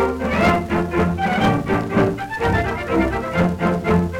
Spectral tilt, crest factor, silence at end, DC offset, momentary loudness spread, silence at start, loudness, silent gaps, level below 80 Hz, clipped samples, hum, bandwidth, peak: -7 dB/octave; 12 dB; 0 s; under 0.1%; 3 LU; 0 s; -19 LUFS; none; -34 dBFS; under 0.1%; none; 15.5 kHz; -6 dBFS